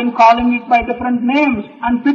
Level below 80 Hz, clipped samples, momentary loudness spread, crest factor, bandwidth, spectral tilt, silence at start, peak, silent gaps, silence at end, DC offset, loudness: -40 dBFS; under 0.1%; 8 LU; 12 dB; 7 kHz; -6 dB/octave; 0 s; 0 dBFS; none; 0 s; under 0.1%; -14 LUFS